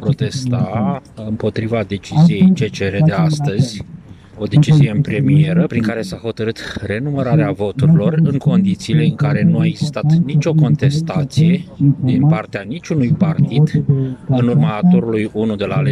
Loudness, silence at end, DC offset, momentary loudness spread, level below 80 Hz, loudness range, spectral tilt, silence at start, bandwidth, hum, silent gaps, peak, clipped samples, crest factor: -15 LUFS; 0 s; under 0.1%; 9 LU; -46 dBFS; 1 LU; -8 dB/octave; 0 s; 10.5 kHz; none; none; -2 dBFS; under 0.1%; 12 dB